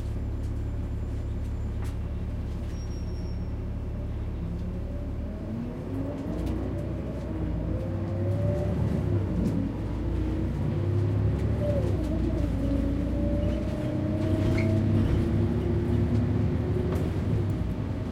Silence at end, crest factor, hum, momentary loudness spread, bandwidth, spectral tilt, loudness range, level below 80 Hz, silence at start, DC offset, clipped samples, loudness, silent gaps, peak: 0 s; 14 dB; none; 8 LU; 9.8 kHz; -9 dB/octave; 8 LU; -34 dBFS; 0 s; under 0.1%; under 0.1%; -29 LUFS; none; -14 dBFS